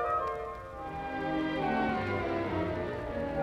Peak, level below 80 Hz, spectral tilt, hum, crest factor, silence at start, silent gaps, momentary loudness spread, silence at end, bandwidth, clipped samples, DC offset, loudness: -20 dBFS; -50 dBFS; -7.5 dB/octave; none; 14 dB; 0 s; none; 9 LU; 0 s; 12 kHz; under 0.1%; under 0.1%; -33 LUFS